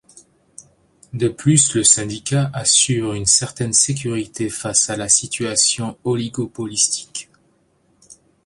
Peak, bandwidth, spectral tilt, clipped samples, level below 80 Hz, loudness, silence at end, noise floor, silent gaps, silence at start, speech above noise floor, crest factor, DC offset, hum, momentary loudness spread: 0 dBFS; 11.5 kHz; -3 dB/octave; under 0.1%; -52 dBFS; -17 LUFS; 0.35 s; -60 dBFS; none; 0.15 s; 42 dB; 20 dB; under 0.1%; none; 11 LU